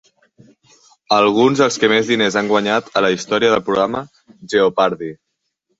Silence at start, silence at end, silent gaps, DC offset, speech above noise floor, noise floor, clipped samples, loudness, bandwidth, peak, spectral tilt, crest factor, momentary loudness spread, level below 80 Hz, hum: 1.1 s; 0.65 s; none; under 0.1%; 55 dB; -70 dBFS; under 0.1%; -16 LUFS; 8 kHz; 0 dBFS; -4 dB/octave; 16 dB; 7 LU; -58 dBFS; none